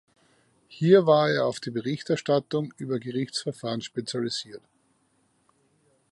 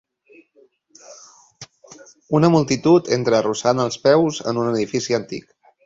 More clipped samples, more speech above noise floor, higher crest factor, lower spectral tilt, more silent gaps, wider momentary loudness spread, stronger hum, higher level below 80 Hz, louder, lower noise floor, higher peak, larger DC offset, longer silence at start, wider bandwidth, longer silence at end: neither; first, 43 dB vs 39 dB; about the same, 22 dB vs 18 dB; about the same, -5.5 dB/octave vs -5.5 dB/octave; neither; first, 12 LU vs 8 LU; neither; second, -74 dBFS vs -58 dBFS; second, -26 LUFS vs -18 LUFS; first, -68 dBFS vs -57 dBFS; second, -6 dBFS vs -2 dBFS; neither; second, 0.7 s vs 1.1 s; first, 11.5 kHz vs 7.8 kHz; first, 1.55 s vs 0.45 s